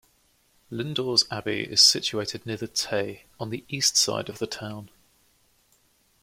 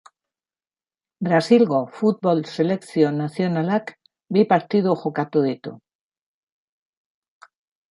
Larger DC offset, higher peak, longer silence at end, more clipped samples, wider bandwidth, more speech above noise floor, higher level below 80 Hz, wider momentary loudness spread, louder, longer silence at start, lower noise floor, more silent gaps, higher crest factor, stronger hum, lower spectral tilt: neither; about the same, -4 dBFS vs -4 dBFS; second, 1.35 s vs 2.15 s; neither; first, 16.5 kHz vs 11.5 kHz; second, 39 dB vs over 70 dB; first, -64 dBFS vs -70 dBFS; first, 18 LU vs 9 LU; second, -24 LUFS vs -21 LUFS; second, 0.7 s vs 1.2 s; second, -65 dBFS vs under -90 dBFS; neither; about the same, 24 dB vs 20 dB; neither; second, -2 dB/octave vs -7.5 dB/octave